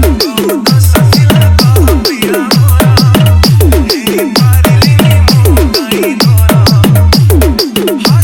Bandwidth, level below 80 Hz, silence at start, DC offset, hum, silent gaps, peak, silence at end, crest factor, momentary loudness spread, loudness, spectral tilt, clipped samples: 18.5 kHz; -14 dBFS; 0 s; under 0.1%; none; none; 0 dBFS; 0 s; 6 dB; 5 LU; -7 LUFS; -5.5 dB/octave; 0.8%